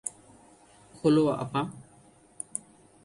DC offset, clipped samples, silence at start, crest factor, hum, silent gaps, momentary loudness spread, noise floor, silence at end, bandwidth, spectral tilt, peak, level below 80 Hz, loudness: under 0.1%; under 0.1%; 0.05 s; 20 dB; none; none; 17 LU; -58 dBFS; 0.45 s; 11.5 kHz; -5.5 dB/octave; -12 dBFS; -66 dBFS; -29 LUFS